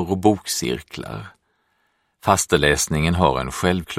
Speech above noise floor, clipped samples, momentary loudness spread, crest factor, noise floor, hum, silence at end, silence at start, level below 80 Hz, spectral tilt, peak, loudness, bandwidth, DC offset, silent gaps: 47 dB; under 0.1%; 15 LU; 20 dB; -68 dBFS; none; 0 s; 0 s; -38 dBFS; -4 dB/octave; 0 dBFS; -20 LUFS; 16 kHz; under 0.1%; none